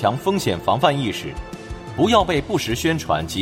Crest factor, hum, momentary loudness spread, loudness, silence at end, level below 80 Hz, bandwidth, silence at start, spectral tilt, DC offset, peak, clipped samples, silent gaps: 20 dB; none; 15 LU; -20 LUFS; 0 s; -40 dBFS; 16 kHz; 0 s; -5 dB/octave; under 0.1%; 0 dBFS; under 0.1%; none